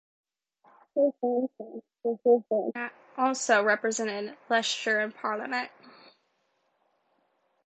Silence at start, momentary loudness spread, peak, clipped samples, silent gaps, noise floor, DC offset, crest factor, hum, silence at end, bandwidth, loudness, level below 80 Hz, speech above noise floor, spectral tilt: 0.95 s; 13 LU; -8 dBFS; under 0.1%; none; -74 dBFS; under 0.1%; 22 dB; none; 1.75 s; 9.2 kHz; -28 LUFS; -84 dBFS; 46 dB; -2.5 dB/octave